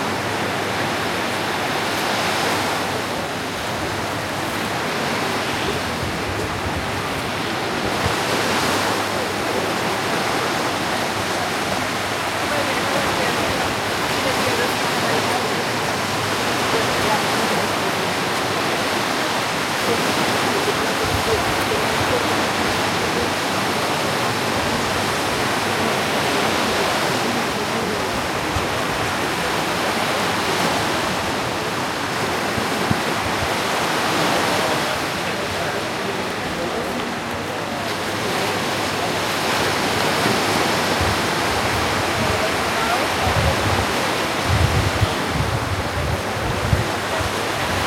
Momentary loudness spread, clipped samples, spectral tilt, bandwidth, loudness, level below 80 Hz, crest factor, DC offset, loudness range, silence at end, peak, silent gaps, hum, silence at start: 5 LU; under 0.1%; -3.5 dB/octave; 16.5 kHz; -20 LUFS; -42 dBFS; 18 dB; under 0.1%; 3 LU; 0 s; -4 dBFS; none; none; 0 s